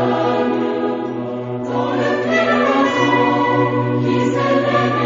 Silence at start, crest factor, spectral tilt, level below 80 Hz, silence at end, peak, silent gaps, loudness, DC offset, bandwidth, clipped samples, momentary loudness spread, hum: 0 s; 14 dB; -6.5 dB/octave; -56 dBFS; 0 s; -2 dBFS; none; -17 LUFS; under 0.1%; 7.6 kHz; under 0.1%; 8 LU; none